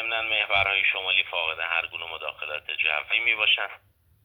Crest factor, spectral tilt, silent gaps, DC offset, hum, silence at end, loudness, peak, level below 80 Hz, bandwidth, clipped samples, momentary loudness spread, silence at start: 20 dB; -3 dB/octave; none; under 0.1%; none; 0.5 s; -23 LUFS; -8 dBFS; -60 dBFS; over 20 kHz; under 0.1%; 12 LU; 0 s